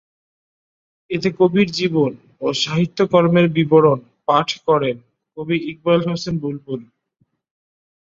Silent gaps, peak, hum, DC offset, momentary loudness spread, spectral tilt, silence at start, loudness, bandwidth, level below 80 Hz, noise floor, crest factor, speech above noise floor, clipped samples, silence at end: none; -2 dBFS; none; under 0.1%; 13 LU; -6.5 dB/octave; 1.1 s; -18 LUFS; 7.6 kHz; -58 dBFS; -66 dBFS; 18 dB; 49 dB; under 0.1%; 1.25 s